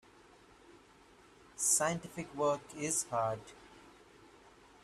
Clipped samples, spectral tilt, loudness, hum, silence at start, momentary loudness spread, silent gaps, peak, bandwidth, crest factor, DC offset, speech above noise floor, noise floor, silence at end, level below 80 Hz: under 0.1%; -3 dB/octave; -34 LUFS; none; 0.7 s; 22 LU; none; -16 dBFS; 15.5 kHz; 22 dB; under 0.1%; 27 dB; -62 dBFS; 0.35 s; -70 dBFS